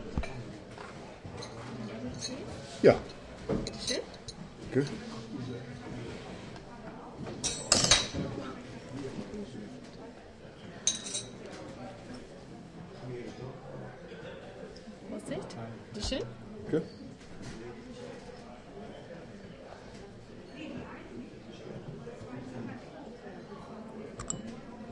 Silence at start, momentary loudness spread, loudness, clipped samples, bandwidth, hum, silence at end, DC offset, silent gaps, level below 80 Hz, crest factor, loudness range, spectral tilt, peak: 0 s; 16 LU; -36 LUFS; under 0.1%; 11.5 kHz; none; 0 s; under 0.1%; none; -54 dBFS; 30 dB; 15 LU; -3.5 dB/octave; -8 dBFS